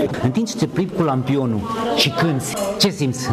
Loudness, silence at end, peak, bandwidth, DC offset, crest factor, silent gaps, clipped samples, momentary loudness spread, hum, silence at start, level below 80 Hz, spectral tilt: -19 LUFS; 0 s; -2 dBFS; 16 kHz; under 0.1%; 16 dB; none; under 0.1%; 5 LU; none; 0 s; -48 dBFS; -5 dB/octave